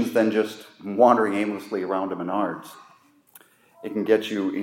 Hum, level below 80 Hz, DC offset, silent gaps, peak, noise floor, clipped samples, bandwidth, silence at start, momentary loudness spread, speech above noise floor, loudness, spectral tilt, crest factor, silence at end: none; -80 dBFS; under 0.1%; none; -4 dBFS; -56 dBFS; under 0.1%; 16.5 kHz; 0 s; 17 LU; 33 dB; -23 LUFS; -6 dB/octave; 22 dB; 0 s